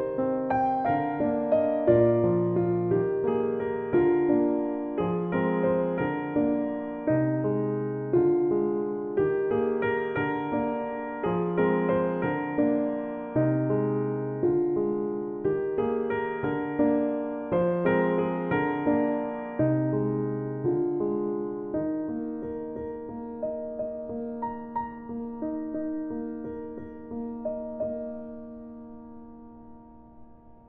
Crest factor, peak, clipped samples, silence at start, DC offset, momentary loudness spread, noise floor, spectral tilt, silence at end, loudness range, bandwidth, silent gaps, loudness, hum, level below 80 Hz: 20 dB; -8 dBFS; under 0.1%; 0 s; under 0.1%; 11 LU; -49 dBFS; -11.5 dB/octave; 0.15 s; 10 LU; 3.5 kHz; none; -27 LUFS; none; -58 dBFS